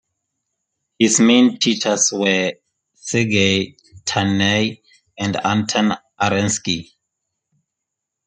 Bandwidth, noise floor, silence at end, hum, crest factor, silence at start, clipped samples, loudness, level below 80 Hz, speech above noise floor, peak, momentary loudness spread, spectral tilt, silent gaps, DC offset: 9.6 kHz; -81 dBFS; 1.45 s; none; 18 dB; 1 s; under 0.1%; -17 LUFS; -60 dBFS; 64 dB; -2 dBFS; 11 LU; -3.5 dB/octave; none; under 0.1%